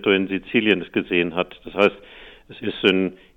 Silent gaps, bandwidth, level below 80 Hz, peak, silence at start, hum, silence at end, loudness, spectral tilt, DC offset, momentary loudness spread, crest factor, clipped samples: none; 7.2 kHz; -54 dBFS; -2 dBFS; 0 s; none; 0.2 s; -21 LUFS; -7 dB/octave; under 0.1%; 10 LU; 20 dB; under 0.1%